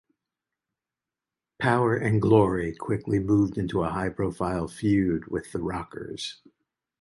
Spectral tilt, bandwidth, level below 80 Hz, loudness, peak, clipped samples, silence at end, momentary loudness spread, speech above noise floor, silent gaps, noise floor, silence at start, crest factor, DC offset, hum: -7.5 dB/octave; 11.5 kHz; -48 dBFS; -26 LUFS; -6 dBFS; under 0.1%; 0.65 s; 13 LU; 64 dB; none; -90 dBFS; 1.6 s; 20 dB; under 0.1%; none